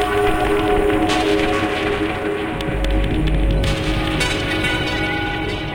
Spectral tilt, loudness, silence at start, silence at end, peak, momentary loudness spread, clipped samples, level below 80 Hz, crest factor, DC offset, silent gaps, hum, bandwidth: -5.5 dB/octave; -19 LUFS; 0 s; 0 s; -4 dBFS; 5 LU; under 0.1%; -26 dBFS; 14 dB; under 0.1%; none; none; 17 kHz